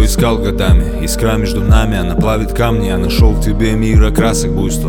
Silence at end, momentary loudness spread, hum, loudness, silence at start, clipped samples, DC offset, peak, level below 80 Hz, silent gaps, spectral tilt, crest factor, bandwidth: 0 s; 3 LU; none; -13 LUFS; 0 s; under 0.1%; under 0.1%; 0 dBFS; -14 dBFS; none; -6 dB/octave; 12 dB; 18 kHz